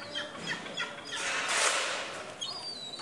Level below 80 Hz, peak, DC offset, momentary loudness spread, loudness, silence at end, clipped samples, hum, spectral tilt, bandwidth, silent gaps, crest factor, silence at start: -74 dBFS; -12 dBFS; under 0.1%; 11 LU; -32 LUFS; 0 s; under 0.1%; none; 0 dB/octave; 11.5 kHz; none; 22 dB; 0 s